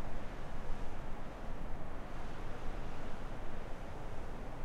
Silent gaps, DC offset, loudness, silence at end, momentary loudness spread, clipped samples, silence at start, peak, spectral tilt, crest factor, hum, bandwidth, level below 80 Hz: none; under 0.1%; -47 LUFS; 0 s; 1 LU; under 0.1%; 0 s; -24 dBFS; -6.5 dB/octave; 12 dB; none; 6.6 kHz; -42 dBFS